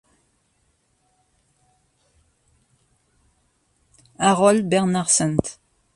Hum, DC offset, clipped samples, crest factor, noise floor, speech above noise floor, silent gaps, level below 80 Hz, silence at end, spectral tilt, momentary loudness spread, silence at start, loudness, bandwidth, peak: none; under 0.1%; under 0.1%; 24 dB; -67 dBFS; 48 dB; none; -54 dBFS; 0.45 s; -4 dB/octave; 8 LU; 4.2 s; -19 LUFS; 11.5 kHz; 0 dBFS